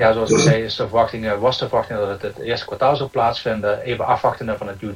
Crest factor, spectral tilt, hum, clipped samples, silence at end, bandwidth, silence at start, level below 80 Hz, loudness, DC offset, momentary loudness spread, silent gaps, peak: 18 dB; -5 dB/octave; none; under 0.1%; 0 s; 15.5 kHz; 0 s; -46 dBFS; -20 LUFS; under 0.1%; 10 LU; none; -2 dBFS